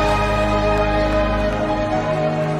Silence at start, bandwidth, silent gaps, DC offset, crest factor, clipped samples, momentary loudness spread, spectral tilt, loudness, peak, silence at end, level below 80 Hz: 0 s; 12.5 kHz; none; under 0.1%; 12 dB; under 0.1%; 2 LU; -6.5 dB/octave; -19 LUFS; -6 dBFS; 0 s; -26 dBFS